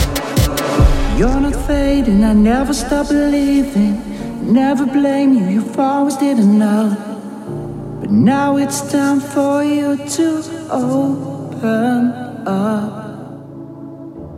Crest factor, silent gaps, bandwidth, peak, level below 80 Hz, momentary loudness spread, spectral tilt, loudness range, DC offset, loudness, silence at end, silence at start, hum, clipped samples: 14 dB; none; 16 kHz; 0 dBFS; -26 dBFS; 14 LU; -6 dB/octave; 4 LU; under 0.1%; -15 LUFS; 0 s; 0 s; none; under 0.1%